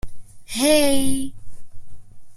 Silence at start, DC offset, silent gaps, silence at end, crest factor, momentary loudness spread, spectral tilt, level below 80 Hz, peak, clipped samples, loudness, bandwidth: 0.05 s; under 0.1%; none; 0 s; 16 dB; 14 LU; -3 dB/octave; -40 dBFS; -4 dBFS; under 0.1%; -20 LUFS; 14.5 kHz